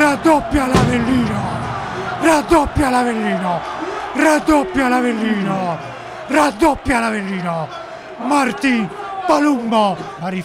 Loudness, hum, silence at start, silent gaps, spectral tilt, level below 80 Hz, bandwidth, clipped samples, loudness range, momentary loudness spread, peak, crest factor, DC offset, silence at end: -17 LUFS; none; 0 s; none; -5.5 dB/octave; -36 dBFS; 16 kHz; under 0.1%; 2 LU; 10 LU; -2 dBFS; 14 dB; under 0.1%; 0 s